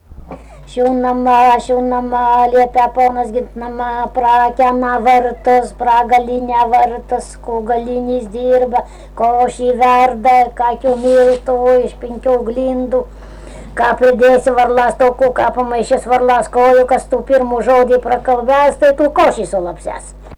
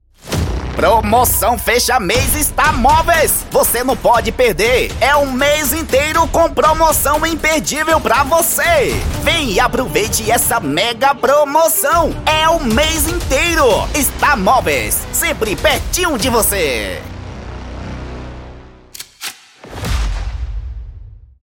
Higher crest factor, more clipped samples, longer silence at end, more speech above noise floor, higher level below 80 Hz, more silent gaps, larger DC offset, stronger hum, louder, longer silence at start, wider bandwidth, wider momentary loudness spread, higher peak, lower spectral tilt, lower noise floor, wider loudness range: second, 8 dB vs 14 dB; neither; second, 0 s vs 0.25 s; about the same, 20 dB vs 22 dB; second, -36 dBFS vs -26 dBFS; neither; neither; first, 50 Hz at -35 dBFS vs none; about the same, -13 LUFS vs -13 LUFS; second, 0.1 s vs 0.25 s; second, 11 kHz vs 17 kHz; second, 10 LU vs 16 LU; second, -4 dBFS vs 0 dBFS; first, -5 dB/octave vs -3 dB/octave; about the same, -33 dBFS vs -36 dBFS; second, 3 LU vs 12 LU